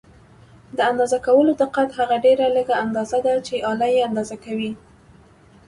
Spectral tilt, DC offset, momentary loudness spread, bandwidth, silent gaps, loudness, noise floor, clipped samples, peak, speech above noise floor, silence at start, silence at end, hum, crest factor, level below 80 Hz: -5 dB/octave; under 0.1%; 11 LU; 11.5 kHz; none; -20 LUFS; -50 dBFS; under 0.1%; -4 dBFS; 31 dB; 0.75 s; 0.9 s; none; 16 dB; -56 dBFS